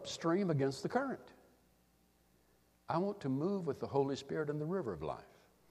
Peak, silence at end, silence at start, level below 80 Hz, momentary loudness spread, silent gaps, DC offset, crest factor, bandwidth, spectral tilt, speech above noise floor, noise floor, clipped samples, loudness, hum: -20 dBFS; 0.45 s; 0 s; -70 dBFS; 8 LU; none; under 0.1%; 20 dB; 14 kHz; -6.5 dB/octave; 35 dB; -72 dBFS; under 0.1%; -37 LUFS; none